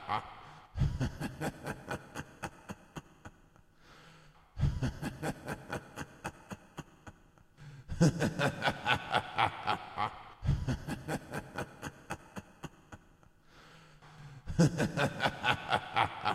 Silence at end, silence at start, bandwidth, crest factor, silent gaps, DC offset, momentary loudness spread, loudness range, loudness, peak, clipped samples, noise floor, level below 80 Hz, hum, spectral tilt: 0 s; 0 s; 15 kHz; 24 dB; none; under 0.1%; 24 LU; 11 LU; -35 LUFS; -12 dBFS; under 0.1%; -62 dBFS; -48 dBFS; none; -5.5 dB/octave